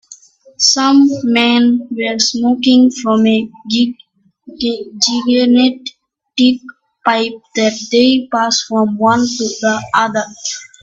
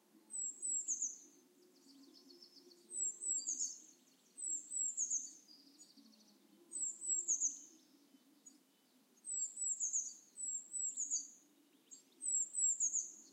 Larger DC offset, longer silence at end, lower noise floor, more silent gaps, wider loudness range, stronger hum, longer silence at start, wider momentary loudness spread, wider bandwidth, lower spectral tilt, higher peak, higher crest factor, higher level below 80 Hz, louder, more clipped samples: neither; first, 0.15 s vs 0 s; second, -41 dBFS vs -73 dBFS; neither; about the same, 3 LU vs 4 LU; neither; about the same, 0.1 s vs 0.15 s; second, 9 LU vs 24 LU; second, 7.8 kHz vs 16 kHz; first, -3 dB/octave vs 2 dB/octave; first, 0 dBFS vs -24 dBFS; second, 14 dB vs 20 dB; first, -56 dBFS vs under -90 dBFS; first, -13 LUFS vs -39 LUFS; neither